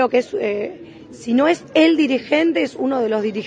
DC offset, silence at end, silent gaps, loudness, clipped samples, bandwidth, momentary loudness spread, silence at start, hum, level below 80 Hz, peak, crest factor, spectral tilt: under 0.1%; 0 s; none; -18 LUFS; under 0.1%; 9.4 kHz; 11 LU; 0 s; none; -64 dBFS; -2 dBFS; 16 dB; -5 dB/octave